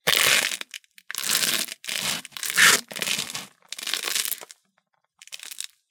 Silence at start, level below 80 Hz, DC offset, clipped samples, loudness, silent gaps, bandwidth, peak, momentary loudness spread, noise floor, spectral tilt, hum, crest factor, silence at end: 0.05 s; -70 dBFS; under 0.1%; under 0.1%; -22 LUFS; none; 19 kHz; 0 dBFS; 21 LU; -71 dBFS; 1 dB/octave; none; 26 dB; 0.25 s